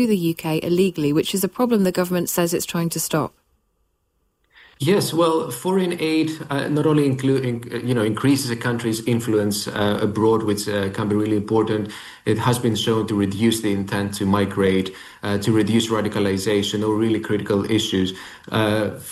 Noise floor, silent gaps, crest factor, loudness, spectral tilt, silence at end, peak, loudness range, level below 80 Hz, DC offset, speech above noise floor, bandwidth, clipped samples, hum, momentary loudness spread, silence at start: -69 dBFS; none; 14 dB; -21 LUFS; -5.5 dB/octave; 0 s; -6 dBFS; 2 LU; -56 dBFS; under 0.1%; 48 dB; 16 kHz; under 0.1%; none; 5 LU; 0 s